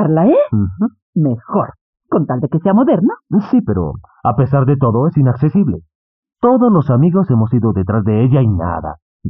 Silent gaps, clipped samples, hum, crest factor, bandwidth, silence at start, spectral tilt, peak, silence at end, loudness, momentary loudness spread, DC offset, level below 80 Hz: 1.02-1.13 s, 1.81-1.93 s, 5.95-6.23 s, 9.02-9.20 s; under 0.1%; none; 12 dB; 3.7 kHz; 0 s; -10.5 dB/octave; -2 dBFS; 0 s; -14 LUFS; 8 LU; under 0.1%; -44 dBFS